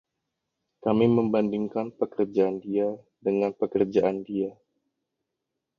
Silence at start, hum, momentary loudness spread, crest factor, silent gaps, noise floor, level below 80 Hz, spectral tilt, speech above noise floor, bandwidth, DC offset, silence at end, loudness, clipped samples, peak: 0.85 s; none; 9 LU; 20 dB; none; -84 dBFS; -64 dBFS; -9 dB/octave; 59 dB; 6.8 kHz; under 0.1%; 1.25 s; -26 LUFS; under 0.1%; -8 dBFS